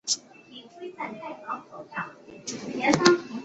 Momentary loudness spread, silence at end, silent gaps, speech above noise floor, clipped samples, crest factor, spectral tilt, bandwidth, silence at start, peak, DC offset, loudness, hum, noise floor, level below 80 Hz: 22 LU; 0 s; none; 19 dB; under 0.1%; 26 dB; -3 dB/octave; 8.2 kHz; 0.05 s; -2 dBFS; under 0.1%; -27 LUFS; none; -48 dBFS; -66 dBFS